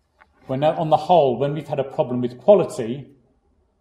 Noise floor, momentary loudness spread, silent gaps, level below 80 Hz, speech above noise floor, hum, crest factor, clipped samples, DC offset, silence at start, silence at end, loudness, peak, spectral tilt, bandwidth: -63 dBFS; 13 LU; none; -60 dBFS; 44 dB; none; 18 dB; under 0.1%; under 0.1%; 0.5 s; 0.75 s; -20 LUFS; -2 dBFS; -7.5 dB/octave; 11.5 kHz